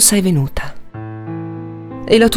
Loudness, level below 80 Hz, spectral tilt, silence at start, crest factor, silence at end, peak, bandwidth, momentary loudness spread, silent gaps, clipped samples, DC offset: -17 LUFS; -36 dBFS; -4 dB/octave; 0 s; 16 dB; 0 s; 0 dBFS; 18 kHz; 18 LU; none; under 0.1%; under 0.1%